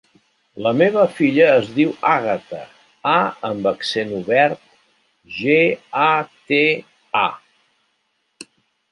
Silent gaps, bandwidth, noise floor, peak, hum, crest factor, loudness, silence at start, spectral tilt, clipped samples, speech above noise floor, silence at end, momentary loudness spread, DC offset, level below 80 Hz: none; 11 kHz; -69 dBFS; -2 dBFS; none; 18 dB; -18 LUFS; 0.55 s; -6 dB/octave; under 0.1%; 51 dB; 0.5 s; 10 LU; under 0.1%; -64 dBFS